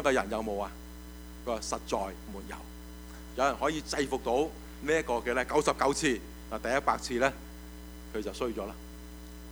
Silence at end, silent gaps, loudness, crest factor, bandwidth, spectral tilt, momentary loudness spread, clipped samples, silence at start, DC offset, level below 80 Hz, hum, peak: 0 s; none; -32 LUFS; 22 dB; over 20 kHz; -4 dB/octave; 18 LU; under 0.1%; 0 s; under 0.1%; -48 dBFS; none; -10 dBFS